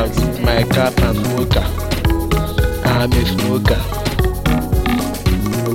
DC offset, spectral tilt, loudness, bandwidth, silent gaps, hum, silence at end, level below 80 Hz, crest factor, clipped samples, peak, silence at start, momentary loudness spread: under 0.1%; -6 dB/octave; -17 LUFS; 17 kHz; none; none; 0 s; -22 dBFS; 14 dB; under 0.1%; -2 dBFS; 0 s; 4 LU